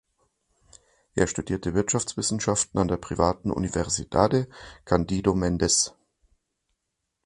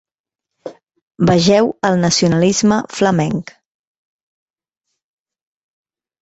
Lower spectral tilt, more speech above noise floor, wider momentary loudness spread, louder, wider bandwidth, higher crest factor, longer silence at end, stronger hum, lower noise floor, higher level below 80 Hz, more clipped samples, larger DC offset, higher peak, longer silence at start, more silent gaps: about the same, -4.5 dB/octave vs -5 dB/octave; second, 56 dB vs 69 dB; second, 6 LU vs 23 LU; second, -25 LUFS vs -14 LUFS; first, 11.5 kHz vs 8.2 kHz; first, 24 dB vs 16 dB; second, 1.35 s vs 2.8 s; neither; about the same, -81 dBFS vs -83 dBFS; first, -44 dBFS vs -50 dBFS; neither; neither; about the same, -4 dBFS vs -2 dBFS; first, 1.15 s vs 0.65 s; second, none vs 1.02-1.11 s